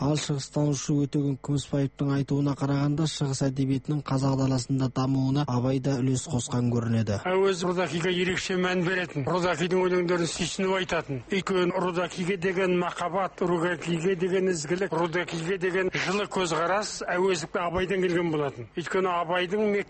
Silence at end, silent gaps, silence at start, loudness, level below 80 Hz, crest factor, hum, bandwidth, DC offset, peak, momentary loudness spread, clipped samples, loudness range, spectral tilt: 0.05 s; none; 0 s; -27 LUFS; -54 dBFS; 14 dB; none; 8.8 kHz; under 0.1%; -12 dBFS; 4 LU; under 0.1%; 1 LU; -5.5 dB/octave